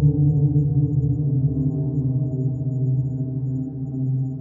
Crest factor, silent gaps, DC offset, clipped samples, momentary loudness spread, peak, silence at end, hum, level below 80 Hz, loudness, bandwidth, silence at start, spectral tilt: 14 dB; none; under 0.1%; under 0.1%; 7 LU; -8 dBFS; 0 s; none; -42 dBFS; -22 LUFS; 1.1 kHz; 0 s; -15 dB/octave